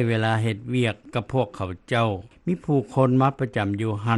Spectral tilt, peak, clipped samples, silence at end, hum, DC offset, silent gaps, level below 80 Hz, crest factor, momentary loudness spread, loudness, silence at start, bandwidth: -7.5 dB/octave; -6 dBFS; under 0.1%; 0 s; none; under 0.1%; none; -56 dBFS; 16 dB; 8 LU; -24 LUFS; 0 s; 11.5 kHz